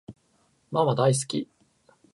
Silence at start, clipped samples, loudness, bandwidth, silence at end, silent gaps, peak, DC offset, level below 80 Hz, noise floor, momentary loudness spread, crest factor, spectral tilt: 0.1 s; under 0.1%; -25 LUFS; 11.5 kHz; 0.7 s; none; -10 dBFS; under 0.1%; -68 dBFS; -67 dBFS; 11 LU; 18 dB; -5.5 dB/octave